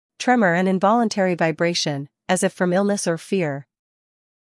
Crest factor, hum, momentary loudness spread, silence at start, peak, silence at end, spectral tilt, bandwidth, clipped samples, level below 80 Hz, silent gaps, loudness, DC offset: 16 dB; none; 7 LU; 0.2 s; -4 dBFS; 0.9 s; -5 dB/octave; 12 kHz; under 0.1%; -72 dBFS; none; -20 LUFS; under 0.1%